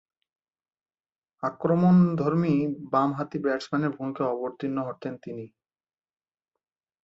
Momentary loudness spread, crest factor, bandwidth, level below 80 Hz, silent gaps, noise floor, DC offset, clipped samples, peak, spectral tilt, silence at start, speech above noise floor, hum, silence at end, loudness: 16 LU; 18 dB; 7.6 kHz; -66 dBFS; none; under -90 dBFS; under 0.1%; under 0.1%; -10 dBFS; -9 dB/octave; 1.4 s; over 65 dB; none; 1.55 s; -26 LUFS